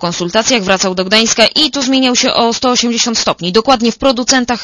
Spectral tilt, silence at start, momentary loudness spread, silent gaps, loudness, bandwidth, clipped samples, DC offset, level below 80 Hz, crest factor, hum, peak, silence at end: -2.5 dB/octave; 0 s; 4 LU; none; -11 LUFS; 11 kHz; 0.4%; under 0.1%; -42 dBFS; 12 dB; none; 0 dBFS; 0 s